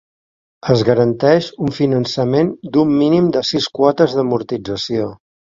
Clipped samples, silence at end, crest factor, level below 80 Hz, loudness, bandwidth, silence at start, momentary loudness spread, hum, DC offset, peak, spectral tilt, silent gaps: under 0.1%; 0.45 s; 16 dB; -50 dBFS; -16 LUFS; 7.6 kHz; 0.65 s; 9 LU; none; under 0.1%; 0 dBFS; -6.5 dB/octave; none